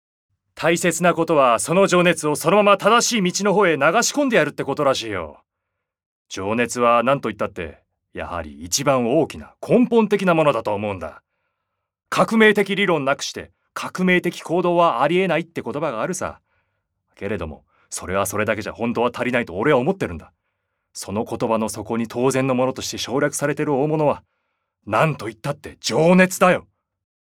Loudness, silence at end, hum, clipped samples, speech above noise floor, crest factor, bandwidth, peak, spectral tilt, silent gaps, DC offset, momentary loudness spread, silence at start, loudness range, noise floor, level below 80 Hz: -19 LUFS; 0.6 s; none; under 0.1%; 60 dB; 20 dB; 17.5 kHz; 0 dBFS; -4.5 dB/octave; 6.06-6.25 s; under 0.1%; 14 LU; 0.55 s; 7 LU; -80 dBFS; -56 dBFS